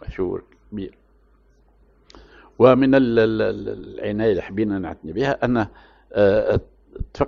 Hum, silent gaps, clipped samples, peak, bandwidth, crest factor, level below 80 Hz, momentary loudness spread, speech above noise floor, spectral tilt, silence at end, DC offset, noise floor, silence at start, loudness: none; none; under 0.1%; 0 dBFS; 7 kHz; 20 dB; -42 dBFS; 18 LU; 37 dB; -8.5 dB/octave; 0 s; under 0.1%; -56 dBFS; 0 s; -20 LUFS